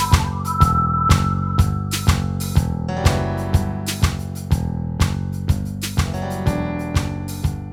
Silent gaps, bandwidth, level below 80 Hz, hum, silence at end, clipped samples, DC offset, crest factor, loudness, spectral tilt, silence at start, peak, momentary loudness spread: none; 17.5 kHz; -26 dBFS; none; 0 s; under 0.1%; under 0.1%; 18 dB; -21 LUFS; -5.5 dB/octave; 0 s; 0 dBFS; 7 LU